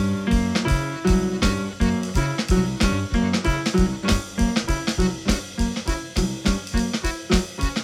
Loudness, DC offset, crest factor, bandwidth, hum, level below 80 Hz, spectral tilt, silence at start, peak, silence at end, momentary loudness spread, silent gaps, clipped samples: -23 LUFS; under 0.1%; 16 dB; 15.5 kHz; none; -26 dBFS; -5 dB/octave; 0 s; -4 dBFS; 0 s; 4 LU; none; under 0.1%